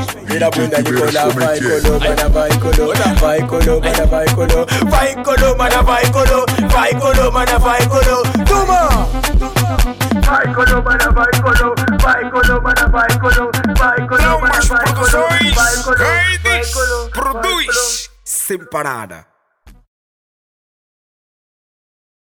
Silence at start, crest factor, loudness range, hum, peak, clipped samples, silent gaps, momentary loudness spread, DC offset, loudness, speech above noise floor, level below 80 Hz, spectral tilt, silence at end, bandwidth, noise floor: 0 s; 10 dB; 6 LU; none; -4 dBFS; under 0.1%; none; 5 LU; under 0.1%; -13 LUFS; 33 dB; -18 dBFS; -4 dB/octave; 2.5 s; 18.5 kHz; -45 dBFS